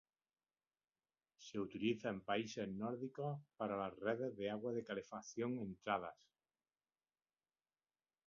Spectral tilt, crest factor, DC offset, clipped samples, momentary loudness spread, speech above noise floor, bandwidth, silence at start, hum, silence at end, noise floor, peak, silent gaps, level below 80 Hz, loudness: -5 dB/octave; 22 dB; under 0.1%; under 0.1%; 6 LU; over 46 dB; 7.2 kHz; 1.4 s; none; 2.15 s; under -90 dBFS; -24 dBFS; none; -80 dBFS; -44 LUFS